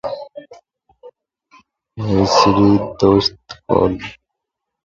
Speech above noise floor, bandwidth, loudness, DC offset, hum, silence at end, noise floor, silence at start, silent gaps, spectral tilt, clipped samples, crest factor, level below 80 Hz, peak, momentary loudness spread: 66 dB; 7.6 kHz; -15 LUFS; under 0.1%; none; 0.7 s; -80 dBFS; 0.05 s; none; -6 dB/octave; under 0.1%; 18 dB; -40 dBFS; 0 dBFS; 20 LU